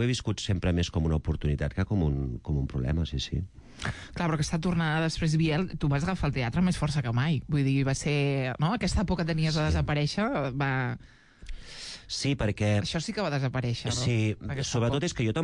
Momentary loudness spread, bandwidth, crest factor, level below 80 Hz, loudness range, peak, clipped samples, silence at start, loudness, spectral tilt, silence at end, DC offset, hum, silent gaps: 7 LU; 11 kHz; 12 dB; -42 dBFS; 3 LU; -16 dBFS; under 0.1%; 0 s; -28 LUFS; -6 dB/octave; 0 s; under 0.1%; none; none